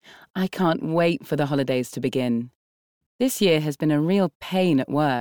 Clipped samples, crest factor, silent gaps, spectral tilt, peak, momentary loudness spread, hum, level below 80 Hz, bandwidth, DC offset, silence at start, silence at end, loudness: under 0.1%; 14 dB; 0.30-0.34 s, 2.55-3.19 s, 4.35-4.40 s; -6 dB/octave; -8 dBFS; 7 LU; none; -62 dBFS; over 20 kHz; 0.1%; 0.1 s; 0 s; -23 LUFS